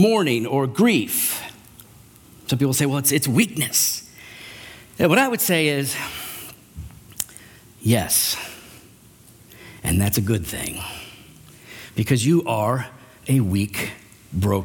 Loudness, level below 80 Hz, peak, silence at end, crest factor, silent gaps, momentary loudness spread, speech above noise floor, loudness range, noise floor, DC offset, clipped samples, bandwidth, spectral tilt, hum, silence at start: -21 LUFS; -48 dBFS; -2 dBFS; 0 s; 20 dB; none; 21 LU; 29 dB; 5 LU; -49 dBFS; under 0.1%; under 0.1%; 18 kHz; -4.5 dB/octave; none; 0 s